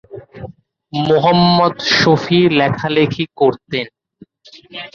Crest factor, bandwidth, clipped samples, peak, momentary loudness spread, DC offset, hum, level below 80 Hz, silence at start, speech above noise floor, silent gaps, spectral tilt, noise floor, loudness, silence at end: 14 dB; 7.2 kHz; under 0.1%; -2 dBFS; 21 LU; under 0.1%; none; -48 dBFS; 0.1 s; 32 dB; none; -6 dB/octave; -47 dBFS; -14 LUFS; 0.05 s